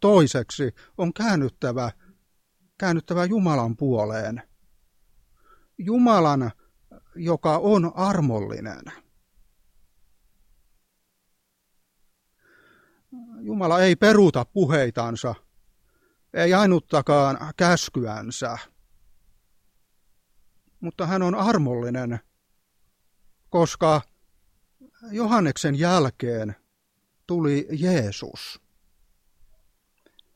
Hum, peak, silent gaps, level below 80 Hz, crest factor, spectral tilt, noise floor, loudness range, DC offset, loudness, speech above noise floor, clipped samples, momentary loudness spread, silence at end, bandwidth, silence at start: none; -4 dBFS; none; -58 dBFS; 20 dB; -6 dB/octave; -72 dBFS; 7 LU; under 0.1%; -22 LUFS; 50 dB; under 0.1%; 16 LU; 1.8 s; 14.5 kHz; 0 s